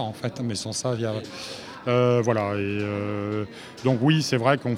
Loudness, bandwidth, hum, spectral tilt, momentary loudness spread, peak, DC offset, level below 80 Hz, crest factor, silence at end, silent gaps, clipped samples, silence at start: -25 LUFS; 15 kHz; none; -5.5 dB/octave; 12 LU; -4 dBFS; under 0.1%; -64 dBFS; 20 dB; 0 s; none; under 0.1%; 0 s